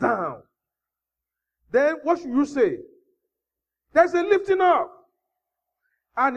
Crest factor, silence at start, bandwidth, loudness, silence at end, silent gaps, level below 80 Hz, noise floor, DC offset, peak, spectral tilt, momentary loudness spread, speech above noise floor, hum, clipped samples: 20 dB; 0 s; 9 kHz; -22 LUFS; 0 s; none; -66 dBFS; -87 dBFS; under 0.1%; -4 dBFS; -5.5 dB/octave; 12 LU; 67 dB; none; under 0.1%